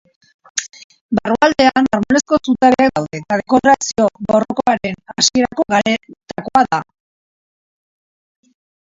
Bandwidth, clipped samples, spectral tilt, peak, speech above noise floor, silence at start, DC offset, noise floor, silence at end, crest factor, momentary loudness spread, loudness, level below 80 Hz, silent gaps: 7.8 kHz; under 0.1%; -3.5 dB/octave; 0 dBFS; over 75 dB; 0.55 s; under 0.1%; under -90 dBFS; 2.05 s; 16 dB; 12 LU; -15 LUFS; -50 dBFS; 0.84-0.90 s, 1.01-1.09 s